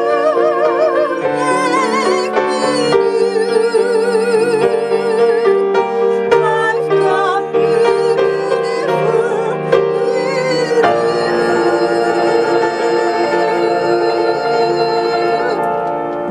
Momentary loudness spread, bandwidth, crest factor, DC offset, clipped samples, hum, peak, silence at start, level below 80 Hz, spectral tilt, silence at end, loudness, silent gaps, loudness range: 3 LU; 10.5 kHz; 14 dB; under 0.1%; under 0.1%; none; 0 dBFS; 0 s; -56 dBFS; -5 dB/octave; 0 s; -14 LUFS; none; 1 LU